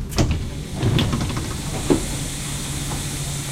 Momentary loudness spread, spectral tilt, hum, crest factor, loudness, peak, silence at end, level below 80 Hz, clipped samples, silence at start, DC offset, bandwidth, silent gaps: 6 LU; -4.5 dB/octave; none; 20 dB; -24 LUFS; -2 dBFS; 0 s; -30 dBFS; under 0.1%; 0 s; under 0.1%; 16 kHz; none